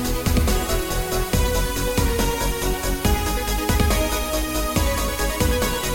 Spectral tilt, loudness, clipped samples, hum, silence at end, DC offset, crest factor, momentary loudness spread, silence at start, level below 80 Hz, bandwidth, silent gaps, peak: -4 dB/octave; -22 LUFS; under 0.1%; none; 0 s; under 0.1%; 14 dB; 3 LU; 0 s; -24 dBFS; 17 kHz; none; -6 dBFS